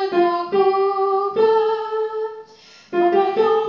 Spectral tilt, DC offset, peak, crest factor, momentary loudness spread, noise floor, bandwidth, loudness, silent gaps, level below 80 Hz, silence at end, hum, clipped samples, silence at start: -6.5 dB/octave; under 0.1%; -6 dBFS; 12 dB; 9 LU; -46 dBFS; 6.8 kHz; -19 LUFS; none; -74 dBFS; 0 s; none; under 0.1%; 0 s